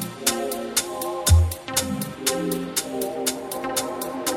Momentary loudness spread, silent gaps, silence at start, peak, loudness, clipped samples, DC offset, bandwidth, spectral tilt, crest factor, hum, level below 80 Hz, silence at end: 9 LU; none; 0 s; -6 dBFS; -24 LUFS; under 0.1%; under 0.1%; 18 kHz; -4 dB/octave; 20 dB; none; -32 dBFS; 0 s